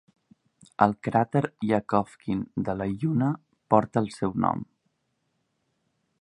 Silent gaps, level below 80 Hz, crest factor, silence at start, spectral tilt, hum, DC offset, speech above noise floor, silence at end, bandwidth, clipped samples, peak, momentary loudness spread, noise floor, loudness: none; -58 dBFS; 26 dB; 0.8 s; -8.5 dB/octave; none; under 0.1%; 50 dB; 1.55 s; 11 kHz; under 0.1%; -2 dBFS; 8 LU; -76 dBFS; -27 LUFS